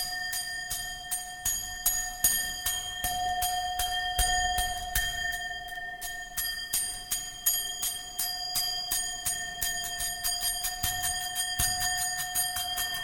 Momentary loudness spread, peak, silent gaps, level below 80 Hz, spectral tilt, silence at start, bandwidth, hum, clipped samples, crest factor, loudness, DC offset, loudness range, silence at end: 7 LU; -10 dBFS; none; -46 dBFS; 0.5 dB/octave; 0 s; 17 kHz; none; under 0.1%; 22 dB; -29 LUFS; under 0.1%; 2 LU; 0 s